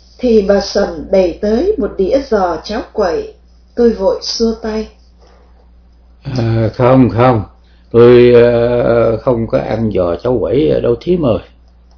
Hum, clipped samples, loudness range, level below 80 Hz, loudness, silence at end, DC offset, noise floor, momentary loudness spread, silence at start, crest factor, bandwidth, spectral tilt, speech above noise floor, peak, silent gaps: none; 0.7%; 7 LU; -34 dBFS; -12 LUFS; 0.55 s; under 0.1%; -43 dBFS; 12 LU; 0.2 s; 12 dB; 5.4 kHz; -7 dB/octave; 32 dB; 0 dBFS; none